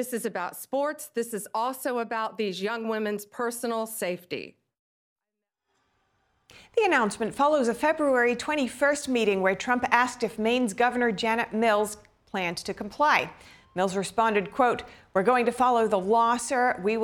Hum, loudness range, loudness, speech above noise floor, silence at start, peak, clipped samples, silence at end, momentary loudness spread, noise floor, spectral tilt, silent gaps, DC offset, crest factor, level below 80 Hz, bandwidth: none; 8 LU; -26 LUFS; 61 dB; 0 s; -4 dBFS; under 0.1%; 0 s; 9 LU; -87 dBFS; -4 dB/octave; 4.79-5.16 s; under 0.1%; 22 dB; -64 dBFS; 18 kHz